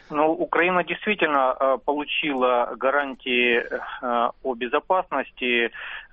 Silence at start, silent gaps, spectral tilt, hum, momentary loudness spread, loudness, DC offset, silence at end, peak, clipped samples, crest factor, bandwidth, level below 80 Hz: 0.1 s; none; -1 dB/octave; none; 6 LU; -23 LUFS; under 0.1%; 0.1 s; -6 dBFS; under 0.1%; 16 dB; 5.6 kHz; -58 dBFS